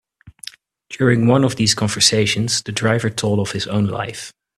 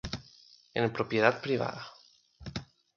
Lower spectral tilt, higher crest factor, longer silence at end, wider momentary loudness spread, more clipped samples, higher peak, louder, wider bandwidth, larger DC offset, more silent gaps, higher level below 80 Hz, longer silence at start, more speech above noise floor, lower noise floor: second, -4 dB/octave vs -6 dB/octave; second, 18 dB vs 24 dB; about the same, 0.3 s vs 0.3 s; first, 21 LU vs 18 LU; neither; first, 0 dBFS vs -8 dBFS; first, -17 LUFS vs -31 LUFS; first, 13.5 kHz vs 7.2 kHz; neither; neither; about the same, -52 dBFS vs -56 dBFS; first, 0.25 s vs 0.05 s; second, 22 dB vs 29 dB; second, -40 dBFS vs -59 dBFS